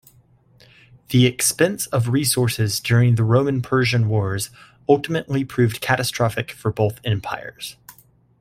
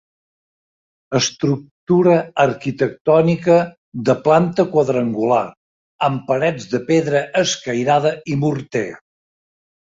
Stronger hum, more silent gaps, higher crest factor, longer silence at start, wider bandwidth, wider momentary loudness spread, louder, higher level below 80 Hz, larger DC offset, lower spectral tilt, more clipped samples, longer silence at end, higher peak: neither; second, none vs 1.71-1.87 s, 3.01-3.05 s, 3.77-3.92 s, 5.57-5.99 s; about the same, 18 dB vs 16 dB; about the same, 1.1 s vs 1.1 s; first, 15.5 kHz vs 7.8 kHz; first, 11 LU vs 8 LU; about the same, -20 LUFS vs -18 LUFS; first, -52 dBFS vs -58 dBFS; neither; about the same, -5 dB/octave vs -5.5 dB/octave; neither; second, 0.5 s vs 0.95 s; about the same, -2 dBFS vs -2 dBFS